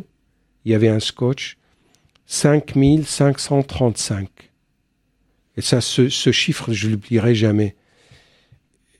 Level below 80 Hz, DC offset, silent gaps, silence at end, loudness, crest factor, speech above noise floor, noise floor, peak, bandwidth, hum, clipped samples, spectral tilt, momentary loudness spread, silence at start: -46 dBFS; under 0.1%; none; 1.3 s; -18 LUFS; 18 dB; 49 dB; -67 dBFS; -2 dBFS; 13.5 kHz; none; under 0.1%; -5 dB/octave; 10 LU; 0.65 s